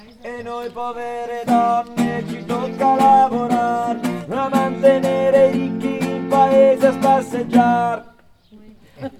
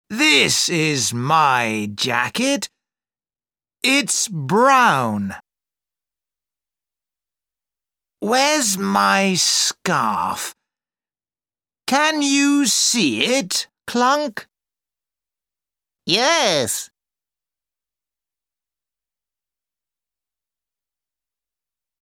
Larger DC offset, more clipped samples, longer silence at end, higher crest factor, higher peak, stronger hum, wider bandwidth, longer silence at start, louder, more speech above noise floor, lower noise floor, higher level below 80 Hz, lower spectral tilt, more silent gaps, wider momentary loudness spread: neither; neither; second, 0.05 s vs 5.15 s; about the same, 16 dB vs 20 dB; about the same, -2 dBFS vs -2 dBFS; neither; second, 15 kHz vs 19 kHz; first, 0.25 s vs 0.1 s; about the same, -17 LUFS vs -17 LUFS; second, 31 dB vs over 72 dB; second, -48 dBFS vs under -90 dBFS; first, -58 dBFS vs -66 dBFS; first, -6.5 dB/octave vs -2.5 dB/octave; neither; about the same, 14 LU vs 12 LU